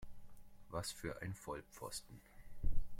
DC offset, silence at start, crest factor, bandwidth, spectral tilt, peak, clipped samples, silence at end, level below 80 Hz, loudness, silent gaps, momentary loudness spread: under 0.1%; 0 s; 18 dB; 15.5 kHz; -4 dB/octave; -22 dBFS; under 0.1%; 0 s; -46 dBFS; -48 LUFS; none; 20 LU